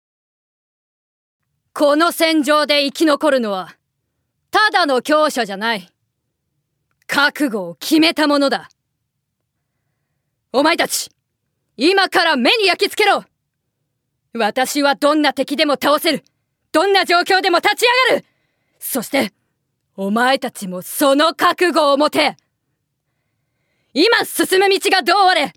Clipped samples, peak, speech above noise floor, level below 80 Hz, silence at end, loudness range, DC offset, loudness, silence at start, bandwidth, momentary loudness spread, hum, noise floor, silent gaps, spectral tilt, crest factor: under 0.1%; 0 dBFS; 59 dB; -70 dBFS; 0.05 s; 4 LU; under 0.1%; -15 LUFS; 1.75 s; 19 kHz; 10 LU; none; -74 dBFS; none; -2.5 dB/octave; 16 dB